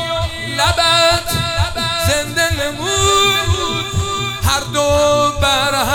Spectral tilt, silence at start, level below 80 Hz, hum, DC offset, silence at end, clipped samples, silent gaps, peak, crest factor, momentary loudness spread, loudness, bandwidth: -3 dB/octave; 0 s; -32 dBFS; none; under 0.1%; 0 s; under 0.1%; none; -2 dBFS; 14 dB; 7 LU; -15 LUFS; 18.5 kHz